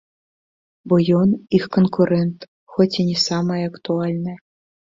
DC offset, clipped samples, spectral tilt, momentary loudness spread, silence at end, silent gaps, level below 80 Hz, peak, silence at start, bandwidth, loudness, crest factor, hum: under 0.1%; under 0.1%; -6.5 dB/octave; 11 LU; 0.5 s; 2.48-2.67 s; -56 dBFS; -2 dBFS; 0.85 s; 7.6 kHz; -19 LUFS; 18 dB; none